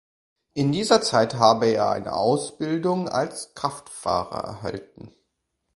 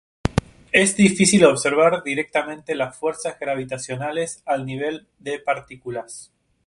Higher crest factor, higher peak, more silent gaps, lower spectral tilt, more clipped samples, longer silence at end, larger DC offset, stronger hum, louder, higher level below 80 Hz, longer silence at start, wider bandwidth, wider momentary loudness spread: about the same, 22 dB vs 20 dB; about the same, -2 dBFS vs 0 dBFS; neither; about the same, -5 dB/octave vs -4 dB/octave; neither; first, 0.7 s vs 0.4 s; neither; neither; about the same, -23 LUFS vs -21 LUFS; second, -56 dBFS vs -44 dBFS; first, 0.55 s vs 0.25 s; about the same, 11.5 kHz vs 11.5 kHz; second, 13 LU vs 16 LU